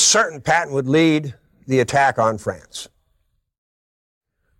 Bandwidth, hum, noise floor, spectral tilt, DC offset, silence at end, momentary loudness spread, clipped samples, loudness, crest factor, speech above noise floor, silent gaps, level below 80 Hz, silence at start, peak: 15.5 kHz; none; -67 dBFS; -3.5 dB/octave; under 0.1%; 1.75 s; 18 LU; under 0.1%; -18 LUFS; 16 dB; 49 dB; none; -56 dBFS; 0 s; -6 dBFS